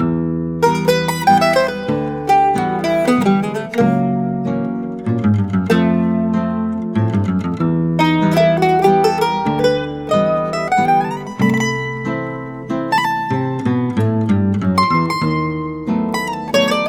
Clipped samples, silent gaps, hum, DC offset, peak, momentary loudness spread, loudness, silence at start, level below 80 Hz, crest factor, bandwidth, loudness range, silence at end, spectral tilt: under 0.1%; none; none; under 0.1%; -2 dBFS; 8 LU; -16 LUFS; 0 s; -46 dBFS; 14 dB; 17 kHz; 3 LU; 0 s; -6.5 dB/octave